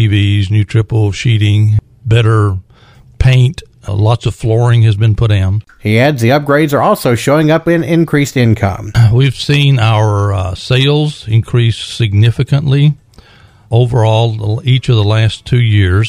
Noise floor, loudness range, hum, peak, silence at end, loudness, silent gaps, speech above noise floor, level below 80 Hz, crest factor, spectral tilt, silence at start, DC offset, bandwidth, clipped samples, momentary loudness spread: -42 dBFS; 2 LU; none; 0 dBFS; 0 s; -11 LUFS; none; 32 dB; -32 dBFS; 10 dB; -7 dB/octave; 0 s; under 0.1%; 15.5 kHz; under 0.1%; 5 LU